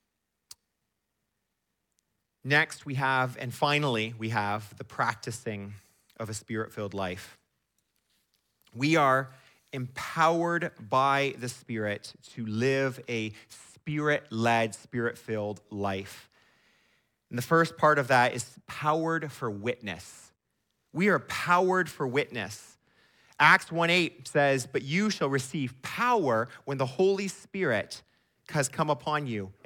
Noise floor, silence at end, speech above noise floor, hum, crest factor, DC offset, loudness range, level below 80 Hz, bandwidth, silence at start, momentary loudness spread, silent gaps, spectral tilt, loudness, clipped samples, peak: -82 dBFS; 0.15 s; 53 dB; none; 22 dB; under 0.1%; 7 LU; -72 dBFS; 17.5 kHz; 2.45 s; 15 LU; none; -5 dB/octave; -28 LUFS; under 0.1%; -6 dBFS